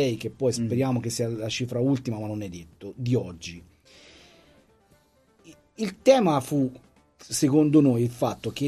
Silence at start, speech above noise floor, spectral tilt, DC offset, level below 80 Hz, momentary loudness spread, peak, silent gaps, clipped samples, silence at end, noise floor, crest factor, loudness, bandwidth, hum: 0 s; 37 dB; -6 dB/octave; under 0.1%; -60 dBFS; 16 LU; -6 dBFS; none; under 0.1%; 0 s; -62 dBFS; 20 dB; -25 LUFS; 13 kHz; none